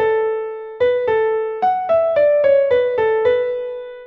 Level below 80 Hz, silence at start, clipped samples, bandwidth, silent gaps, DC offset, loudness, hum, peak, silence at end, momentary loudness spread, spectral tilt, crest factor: -56 dBFS; 0 s; under 0.1%; 5.6 kHz; none; under 0.1%; -17 LUFS; none; -6 dBFS; 0 s; 9 LU; -6 dB/octave; 12 dB